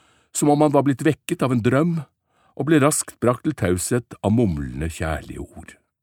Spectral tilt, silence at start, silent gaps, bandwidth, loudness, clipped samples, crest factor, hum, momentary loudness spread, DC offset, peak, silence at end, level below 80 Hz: -6 dB/octave; 0.35 s; none; 17.5 kHz; -21 LUFS; under 0.1%; 20 dB; none; 12 LU; under 0.1%; -2 dBFS; 0.3 s; -42 dBFS